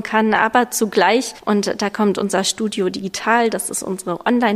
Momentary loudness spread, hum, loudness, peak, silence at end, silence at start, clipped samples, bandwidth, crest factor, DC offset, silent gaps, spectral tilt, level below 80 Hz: 7 LU; none; -18 LUFS; -2 dBFS; 0 s; 0 s; under 0.1%; 15.5 kHz; 16 dB; under 0.1%; none; -3.5 dB/octave; -58 dBFS